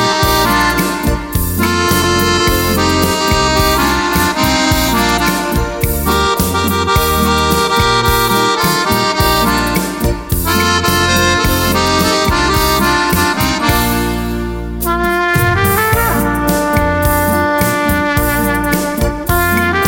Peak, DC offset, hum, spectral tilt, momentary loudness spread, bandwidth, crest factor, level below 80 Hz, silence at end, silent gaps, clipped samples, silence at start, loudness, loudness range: 0 dBFS; under 0.1%; none; -4 dB/octave; 5 LU; 17 kHz; 12 dB; -24 dBFS; 0 s; none; under 0.1%; 0 s; -12 LUFS; 2 LU